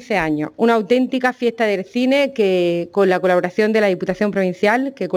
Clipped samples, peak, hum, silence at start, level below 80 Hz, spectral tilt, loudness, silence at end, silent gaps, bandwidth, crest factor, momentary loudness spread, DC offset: under 0.1%; -4 dBFS; none; 0 s; -54 dBFS; -6 dB/octave; -17 LUFS; 0 s; none; 17 kHz; 14 dB; 4 LU; under 0.1%